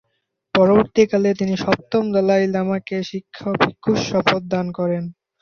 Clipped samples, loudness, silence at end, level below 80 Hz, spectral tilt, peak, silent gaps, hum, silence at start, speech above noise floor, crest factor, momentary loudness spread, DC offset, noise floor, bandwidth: under 0.1%; -19 LUFS; 0.3 s; -54 dBFS; -6 dB/octave; -2 dBFS; none; none; 0.55 s; 54 dB; 18 dB; 11 LU; under 0.1%; -73 dBFS; 7 kHz